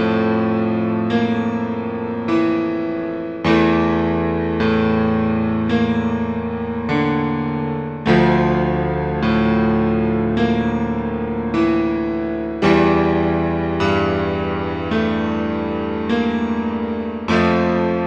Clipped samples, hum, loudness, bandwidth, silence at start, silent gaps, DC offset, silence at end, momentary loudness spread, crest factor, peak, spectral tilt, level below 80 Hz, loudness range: under 0.1%; none; -19 LUFS; 7.4 kHz; 0 s; none; 0.2%; 0 s; 7 LU; 16 dB; -2 dBFS; -8 dB/octave; -38 dBFS; 2 LU